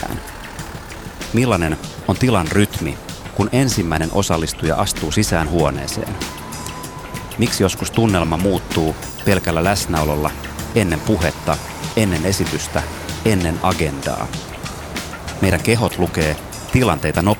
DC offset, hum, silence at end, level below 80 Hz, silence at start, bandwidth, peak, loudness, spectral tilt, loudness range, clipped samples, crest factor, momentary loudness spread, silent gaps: under 0.1%; none; 0 s; -34 dBFS; 0 s; 20 kHz; -2 dBFS; -19 LUFS; -5 dB/octave; 2 LU; under 0.1%; 18 dB; 12 LU; none